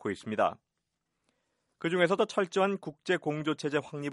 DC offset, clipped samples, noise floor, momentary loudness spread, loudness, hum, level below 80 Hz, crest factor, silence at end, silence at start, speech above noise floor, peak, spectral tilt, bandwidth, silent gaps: under 0.1%; under 0.1%; -84 dBFS; 7 LU; -30 LUFS; none; -76 dBFS; 20 dB; 0 s; 0.05 s; 54 dB; -12 dBFS; -5.5 dB/octave; 11.5 kHz; none